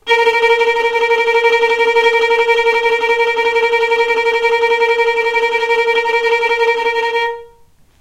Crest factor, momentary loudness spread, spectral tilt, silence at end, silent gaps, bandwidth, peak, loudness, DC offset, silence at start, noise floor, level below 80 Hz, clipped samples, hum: 12 dB; 3 LU; -0.5 dB/octave; 0.55 s; none; 13.5 kHz; -2 dBFS; -13 LUFS; under 0.1%; 0.05 s; -47 dBFS; -52 dBFS; under 0.1%; none